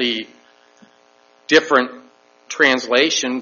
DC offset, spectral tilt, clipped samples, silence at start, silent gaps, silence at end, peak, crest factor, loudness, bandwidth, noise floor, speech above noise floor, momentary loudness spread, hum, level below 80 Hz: under 0.1%; 0 dB/octave; under 0.1%; 0 s; none; 0 s; 0 dBFS; 20 dB; -16 LUFS; 7.2 kHz; -54 dBFS; 37 dB; 18 LU; none; -64 dBFS